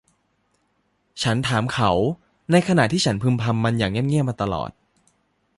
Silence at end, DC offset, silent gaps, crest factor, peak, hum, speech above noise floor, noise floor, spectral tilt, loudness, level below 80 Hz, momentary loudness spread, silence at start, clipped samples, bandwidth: 0.9 s; under 0.1%; none; 20 dB; -4 dBFS; none; 48 dB; -68 dBFS; -5.5 dB/octave; -21 LUFS; -48 dBFS; 8 LU; 1.15 s; under 0.1%; 11.5 kHz